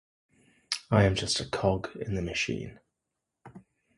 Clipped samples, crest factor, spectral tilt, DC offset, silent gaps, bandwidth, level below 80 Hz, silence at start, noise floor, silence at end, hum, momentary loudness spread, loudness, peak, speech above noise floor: under 0.1%; 22 dB; -5 dB/octave; under 0.1%; none; 11.5 kHz; -48 dBFS; 0.7 s; -85 dBFS; 0.4 s; none; 11 LU; -29 LUFS; -8 dBFS; 57 dB